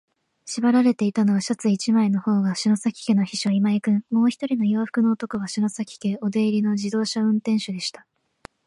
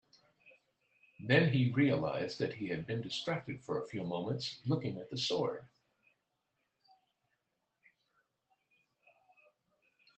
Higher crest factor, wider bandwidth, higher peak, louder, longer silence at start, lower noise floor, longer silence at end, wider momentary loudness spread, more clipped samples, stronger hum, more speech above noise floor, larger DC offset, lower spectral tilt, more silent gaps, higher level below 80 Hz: second, 14 dB vs 24 dB; first, 11 kHz vs 8.6 kHz; first, -8 dBFS vs -14 dBFS; first, -22 LUFS vs -35 LUFS; about the same, 0.45 s vs 0.45 s; second, -49 dBFS vs -84 dBFS; second, 0.75 s vs 4.5 s; second, 6 LU vs 10 LU; neither; neither; second, 28 dB vs 49 dB; neither; about the same, -5.5 dB/octave vs -6 dB/octave; neither; first, -68 dBFS vs -74 dBFS